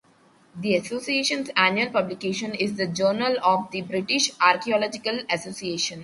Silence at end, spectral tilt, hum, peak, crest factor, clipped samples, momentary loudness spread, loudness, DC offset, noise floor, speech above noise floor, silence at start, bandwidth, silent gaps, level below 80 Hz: 0 s; -3 dB/octave; none; -2 dBFS; 22 dB; under 0.1%; 8 LU; -24 LUFS; under 0.1%; -58 dBFS; 33 dB; 0.55 s; 11.5 kHz; none; -66 dBFS